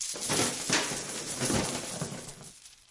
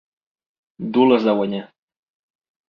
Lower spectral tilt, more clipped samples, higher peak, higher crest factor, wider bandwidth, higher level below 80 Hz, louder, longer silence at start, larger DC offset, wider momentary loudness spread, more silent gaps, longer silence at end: second, -2.5 dB/octave vs -8.5 dB/octave; neither; second, -14 dBFS vs -4 dBFS; about the same, 20 dB vs 20 dB; first, 11.5 kHz vs 5.8 kHz; first, -56 dBFS vs -66 dBFS; second, -30 LUFS vs -18 LUFS; second, 0 s vs 0.8 s; neither; first, 18 LU vs 15 LU; neither; second, 0.15 s vs 1.05 s